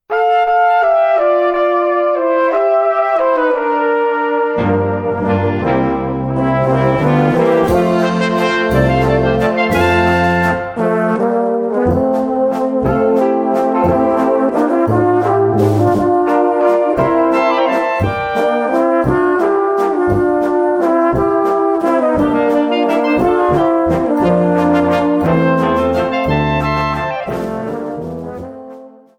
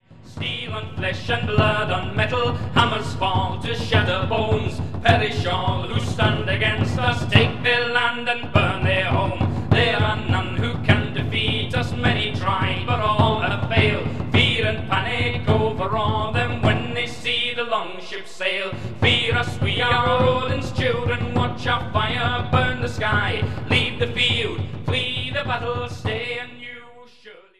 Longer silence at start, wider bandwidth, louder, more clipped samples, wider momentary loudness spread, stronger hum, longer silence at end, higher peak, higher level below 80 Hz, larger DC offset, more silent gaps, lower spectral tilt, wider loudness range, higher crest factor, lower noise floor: about the same, 0.1 s vs 0 s; first, 16.5 kHz vs 11 kHz; first, -14 LUFS vs -21 LUFS; neither; second, 4 LU vs 8 LU; neither; first, 0.3 s vs 0 s; about the same, 0 dBFS vs 0 dBFS; about the same, -36 dBFS vs -40 dBFS; second, under 0.1% vs 2%; neither; first, -7.5 dB/octave vs -6 dB/octave; about the same, 2 LU vs 3 LU; second, 12 dB vs 22 dB; second, -36 dBFS vs -46 dBFS